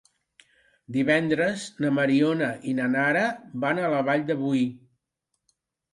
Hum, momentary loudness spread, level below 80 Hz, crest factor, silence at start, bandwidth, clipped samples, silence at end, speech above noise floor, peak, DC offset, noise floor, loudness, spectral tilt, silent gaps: none; 6 LU; -70 dBFS; 18 dB; 0.9 s; 11.5 kHz; under 0.1%; 1.15 s; 56 dB; -8 dBFS; under 0.1%; -80 dBFS; -25 LUFS; -6 dB/octave; none